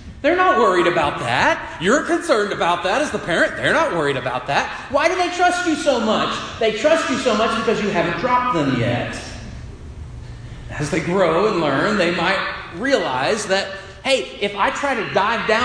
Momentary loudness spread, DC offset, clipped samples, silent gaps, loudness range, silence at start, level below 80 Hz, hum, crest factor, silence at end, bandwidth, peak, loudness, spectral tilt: 11 LU; under 0.1%; under 0.1%; none; 4 LU; 0 s; -42 dBFS; none; 16 dB; 0 s; 10.5 kHz; -2 dBFS; -19 LUFS; -4.5 dB/octave